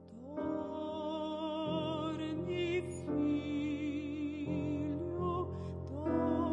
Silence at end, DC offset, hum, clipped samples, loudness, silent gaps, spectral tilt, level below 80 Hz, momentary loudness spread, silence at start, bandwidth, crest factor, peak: 0 s; under 0.1%; none; under 0.1%; -37 LUFS; none; -7.5 dB/octave; -64 dBFS; 6 LU; 0 s; 10.5 kHz; 14 dB; -22 dBFS